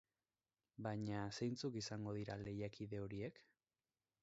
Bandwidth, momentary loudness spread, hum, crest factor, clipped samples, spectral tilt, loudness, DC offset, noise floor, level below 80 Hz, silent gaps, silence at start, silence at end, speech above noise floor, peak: 7.6 kHz; 6 LU; none; 18 dB; under 0.1%; -6 dB/octave; -47 LUFS; under 0.1%; under -90 dBFS; -72 dBFS; none; 0.8 s; 0.8 s; over 43 dB; -30 dBFS